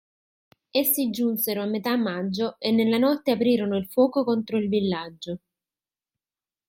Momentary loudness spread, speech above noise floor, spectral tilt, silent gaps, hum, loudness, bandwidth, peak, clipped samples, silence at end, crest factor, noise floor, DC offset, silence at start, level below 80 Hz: 7 LU; over 66 dB; -5 dB/octave; none; none; -24 LUFS; 16.5 kHz; -8 dBFS; under 0.1%; 1.3 s; 18 dB; under -90 dBFS; under 0.1%; 0.75 s; -70 dBFS